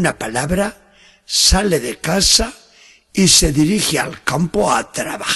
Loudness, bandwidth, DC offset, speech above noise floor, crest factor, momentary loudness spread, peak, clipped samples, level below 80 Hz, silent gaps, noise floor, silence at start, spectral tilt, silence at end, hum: -15 LUFS; 13 kHz; under 0.1%; 32 dB; 16 dB; 11 LU; 0 dBFS; under 0.1%; -30 dBFS; none; -48 dBFS; 0 s; -3 dB/octave; 0 s; none